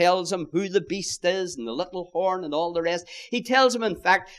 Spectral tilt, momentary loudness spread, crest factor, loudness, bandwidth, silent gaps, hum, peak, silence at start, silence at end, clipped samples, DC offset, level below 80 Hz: -3.5 dB/octave; 10 LU; 20 dB; -25 LUFS; 13 kHz; none; none; -4 dBFS; 0 s; 0 s; under 0.1%; under 0.1%; -60 dBFS